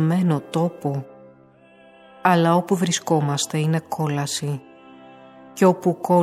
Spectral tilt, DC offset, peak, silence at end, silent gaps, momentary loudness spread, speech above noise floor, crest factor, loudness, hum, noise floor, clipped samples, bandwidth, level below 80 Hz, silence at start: -5.5 dB/octave; under 0.1%; -4 dBFS; 0 s; none; 11 LU; 31 dB; 18 dB; -21 LUFS; none; -51 dBFS; under 0.1%; 14.5 kHz; -70 dBFS; 0 s